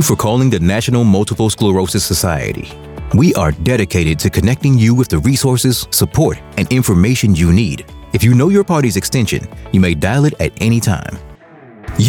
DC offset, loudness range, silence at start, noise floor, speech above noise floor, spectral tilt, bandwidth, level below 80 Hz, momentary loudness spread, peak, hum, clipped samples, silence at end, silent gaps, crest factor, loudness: under 0.1%; 2 LU; 0 s; -39 dBFS; 26 dB; -5.5 dB/octave; over 20 kHz; -34 dBFS; 10 LU; -2 dBFS; none; under 0.1%; 0 s; none; 12 dB; -13 LUFS